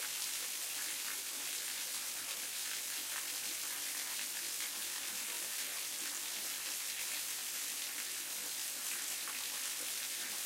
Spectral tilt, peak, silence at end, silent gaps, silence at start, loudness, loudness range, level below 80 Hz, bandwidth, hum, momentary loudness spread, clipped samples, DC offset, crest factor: 2.5 dB/octave; -22 dBFS; 0 s; none; 0 s; -38 LUFS; 0 LU; -88 dBFS; 16 kHz; none; 1 LU; under 0.1%; under 0.1%; 18 dB